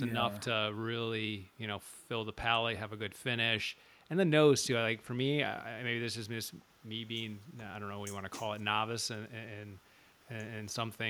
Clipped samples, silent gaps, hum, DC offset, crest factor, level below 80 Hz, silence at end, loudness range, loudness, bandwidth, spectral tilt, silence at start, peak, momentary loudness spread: under 0.1%; none; none; under 0.1%; 22 dB; -66 dBFS; 0 s; 8 LU; -35 LUFS; over 20 kHz; -4 dB/octave; 0 s; -14 dBFS; 15 LU